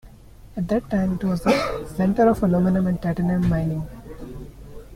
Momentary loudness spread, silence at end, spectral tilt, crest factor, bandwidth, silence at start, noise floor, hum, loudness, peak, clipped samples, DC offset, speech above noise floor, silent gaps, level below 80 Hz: 20 LU; 0 s; -8 dB/octave; 18 dB; 15 kHz; 0.05 s; -44 dBFS; none; -22 LUFS; -6 dBFS; under 0.1%; under 0.1%; 24 dB; none; -40 dBFS